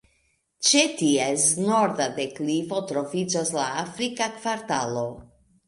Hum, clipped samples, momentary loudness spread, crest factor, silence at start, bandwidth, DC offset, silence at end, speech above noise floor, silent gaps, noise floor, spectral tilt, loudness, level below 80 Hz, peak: none; under 0.1%; 9 LU; 20 dB; 0.6 s; 11.5 kHz; under 0.1%; 0.45 s; 44 dB; none; -69 dBFS; -3 dB/octave; -24 LUFS; -64 dBFS; -6 dBFS